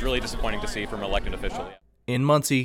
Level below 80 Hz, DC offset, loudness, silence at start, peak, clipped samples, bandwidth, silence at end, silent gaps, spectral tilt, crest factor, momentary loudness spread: -34 dBFS; under 0.1%; -27 LUFS; 0 s; -8 dBFS; under 0.1%; 16.5 kHz; 0 s; none; -5 dB/octave; 18 dB; 14 LU